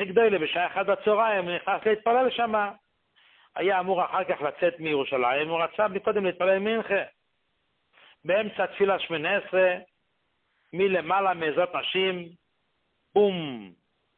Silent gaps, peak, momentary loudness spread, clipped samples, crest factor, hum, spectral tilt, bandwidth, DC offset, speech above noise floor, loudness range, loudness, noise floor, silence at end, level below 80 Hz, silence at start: none; -8 dBFS; 7 LU; under 0.1%; 18 dB; none; -9 dB/octave; 4.3 kHz; under 0.1%; 50 dB; 2 LU; -25 LUFS; -75 dBFS; 0.45 s; -70 dBFS; 0 s